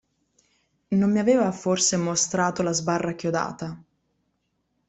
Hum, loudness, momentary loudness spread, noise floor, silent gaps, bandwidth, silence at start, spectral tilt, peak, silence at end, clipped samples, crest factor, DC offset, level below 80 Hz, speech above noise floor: none; -23 LUFS; 10 LU; -74 dBFS; none; 8.4 kHz; 0.9 s; -4 dB/octave; -8 dBFS; 1.1 s; under 0.1%; 16 dB; under 0.1%; -62 dBFS; 51 dB